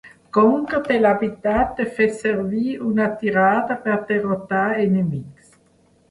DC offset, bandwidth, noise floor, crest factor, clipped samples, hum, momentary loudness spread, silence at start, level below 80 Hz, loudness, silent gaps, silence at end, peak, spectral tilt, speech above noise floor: under 0.1%; 11.5 kHz; -57 dBFS; 16 dB; under 0.1%; none; 6 LU; 0.05 s; -48 dBFS; -20 LUFS; none; 0.8 s; -4 dBFS; -7.5 dB/octave; 38 dB